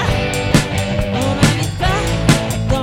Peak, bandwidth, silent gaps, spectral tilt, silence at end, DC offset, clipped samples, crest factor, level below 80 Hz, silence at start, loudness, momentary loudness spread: 0 dBFS; 17.5 kHz; none; -5 dB/octave; 0 s; under 0.1%; under 0.1%; 16 dB; -26 dBFS; 0 s; -16 LUFS; 4 LU